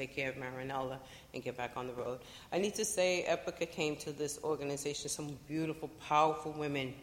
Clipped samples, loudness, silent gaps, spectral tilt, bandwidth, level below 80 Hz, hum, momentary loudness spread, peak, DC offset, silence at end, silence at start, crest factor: under 0.1%; -37 LUFS; none; -3.5 dB/octave; 16.5 kHz; -66 dBFS; none; 11 LU; -16 dBFS; under 0.1%; 0 s; 0 s; 20 dB